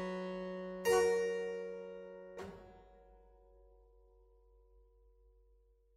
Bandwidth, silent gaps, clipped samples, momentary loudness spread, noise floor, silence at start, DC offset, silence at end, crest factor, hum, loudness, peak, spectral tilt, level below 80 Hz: 15.5 kHz; none; under 0.1%; 20 LU; -69 dBFS; 0 s; under 0.1%; 2.3 s; 22 dB; none; -37 LUFS; -20 dBFS; -4.5 dB/octave; -68 dBFS